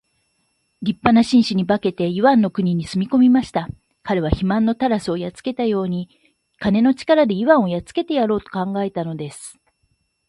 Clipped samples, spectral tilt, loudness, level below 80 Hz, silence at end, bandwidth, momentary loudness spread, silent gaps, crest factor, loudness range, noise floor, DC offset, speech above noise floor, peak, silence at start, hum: under 0.1%; -7 dB/octave; -19 LUFS; -44 dBFS; 0.75 s; 11.5 kHz; 12 LU; none; 18 dB; 3 LU; -68 dBFS; under 0.1%; 50 dB; 0 dBFS; 0.8 s; none